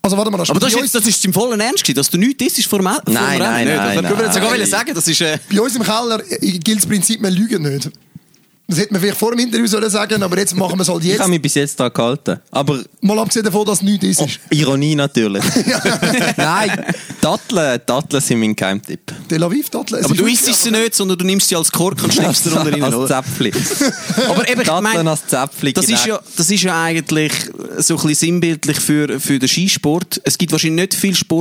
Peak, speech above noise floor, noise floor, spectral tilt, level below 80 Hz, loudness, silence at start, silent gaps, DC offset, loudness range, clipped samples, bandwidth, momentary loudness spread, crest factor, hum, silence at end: 0 dBFS; 37 dB; -53 dBFS; -3.5 dB/octave; -54 dBFS; -15 LUFS; 0.05 s; none; under 0.1%; 3 LU; under 0.1%; over 20 kHz; 5 LU; 14 dB; none; 0 s